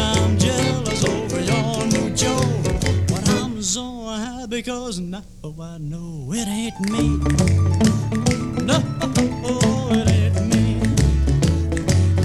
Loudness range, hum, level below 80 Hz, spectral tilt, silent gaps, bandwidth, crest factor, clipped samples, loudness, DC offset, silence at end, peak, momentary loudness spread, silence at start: 7 LU; none; -30 dBFS; -5.5 dB/octave; none; 14 kHz; 16 dB; under 0.1%; -20 LUFS; 0.3%; 0 s; -4 dBFS; 10 LU; 0 s